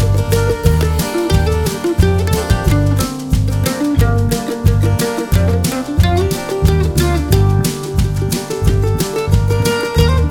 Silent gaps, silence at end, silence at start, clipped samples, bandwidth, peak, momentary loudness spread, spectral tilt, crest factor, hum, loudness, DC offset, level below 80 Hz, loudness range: none; 0 s; 0 s; under 0.1%; 18.5 kHz; 0 dBFS; 4 LU; -6 dB/octave; 14 dB; none; -15 LUFS; under 0.1%; -20 dBFS; 1 LU